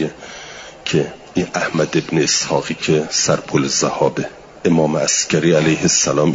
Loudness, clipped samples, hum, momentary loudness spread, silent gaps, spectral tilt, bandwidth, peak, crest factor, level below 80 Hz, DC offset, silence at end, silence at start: -17 LUFS; under 0.1%; none; 12 LU; none; -3.5 dB/octave; 7.8 kHz; -2 dBFS; 16 dB; -52 dBFS; under 0.1%; 0 s; 0 s